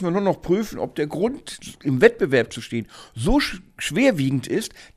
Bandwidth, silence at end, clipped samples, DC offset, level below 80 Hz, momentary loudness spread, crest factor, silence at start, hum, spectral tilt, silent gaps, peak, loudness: 15.5 kHz; 0.1 s; under 0.1%; under 0.1%; -38 dBFS; 13 LU; 22 dB; 0 s; none; -5.5 dB/octave; none; 0 dBFS; -22 LUFS